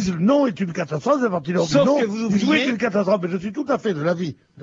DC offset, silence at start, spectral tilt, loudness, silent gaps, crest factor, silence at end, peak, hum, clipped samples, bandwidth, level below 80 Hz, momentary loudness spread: under 0.1%; 0 s; -6 dB/octave; -20 LUFS; none; 16 dB; 0 s; -4 dBFS; none; under 0.1%; 7.8 kHz; -56 dBFS; 8 LU